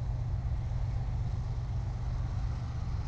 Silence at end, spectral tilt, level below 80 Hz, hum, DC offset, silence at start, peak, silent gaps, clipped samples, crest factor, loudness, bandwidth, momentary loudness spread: 0 s; -8 dB/octave; -36 dBFS; none; under 0.1%; 0 s; -22 dBFS; none; under 0.1%; 10 dB; -36 LUFS; 7.6 kHz; 2 LU